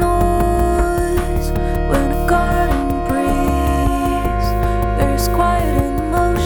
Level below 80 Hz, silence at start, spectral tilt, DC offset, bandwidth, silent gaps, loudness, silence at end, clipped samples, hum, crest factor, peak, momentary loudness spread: -20 dBFS; 0 s; -6.5 dB/octave; under 0.1%; over 20 kHz; none; -17 LUFS; 0 s; under 0.1%; none; 12 dB; -4 dBFS; 3 LU